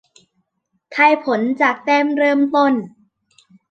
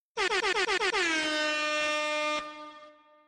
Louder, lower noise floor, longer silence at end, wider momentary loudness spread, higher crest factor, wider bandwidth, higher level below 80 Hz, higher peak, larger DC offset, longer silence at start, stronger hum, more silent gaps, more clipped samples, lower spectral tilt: first, -16 LUFS vs -28 LUFS; first, -71 dBFS vs -54 dBFS; first, 0.8 s vs 0.35 s; second, 8 LU vs 11 LU; about the same, 16 dB vs 14 dB; second, 7.6 kHz vs 13 kHz; second, -72 dBFS vs -64 dBFS; first, -2 dBFS vs -16 dBFS; neither; first, 0.9 s vs 0.15 s; neither; neither; neither; first, -5 dB/octave vs -0.5 dB/octave